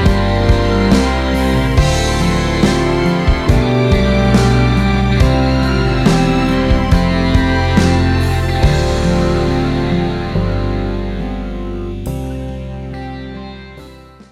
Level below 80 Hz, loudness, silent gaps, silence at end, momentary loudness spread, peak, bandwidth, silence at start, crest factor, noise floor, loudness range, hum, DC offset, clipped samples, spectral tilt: -20 dBFS; -14 LUFS; none; 0.35 s; 12 LU; 0 dBFS; 14.5 kHz; 0 s; 14 dB; -37 dBFS; 9 LU; none; under 0.1%; under 0.1%; -6.5 dB/octave